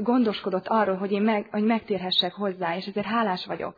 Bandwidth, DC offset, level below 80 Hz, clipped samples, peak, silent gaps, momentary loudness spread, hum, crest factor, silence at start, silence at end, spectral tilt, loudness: 5 kHz; under 0.1%; -68 dBFS; under 0.1%; -10 dBFS; none; 6 LU; none; 16 dB; 0 s; 0.05 s; -7.5 dB/octave; -25 LUFS